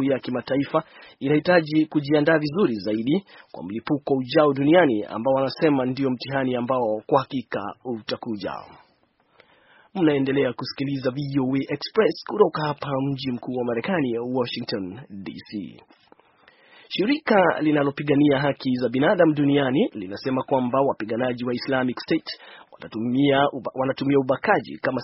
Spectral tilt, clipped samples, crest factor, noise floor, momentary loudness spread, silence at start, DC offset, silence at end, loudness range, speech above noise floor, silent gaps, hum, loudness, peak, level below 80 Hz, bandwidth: -5 dB/octave; under 0.1%; 20 dB; -64 dBFS; 13 LU; 0 s; under 0.1%; 0 s; 7 LU; 41 dB; none; none; -23 LUFS; -2 dBFS; -62 dBFS; 6 kHz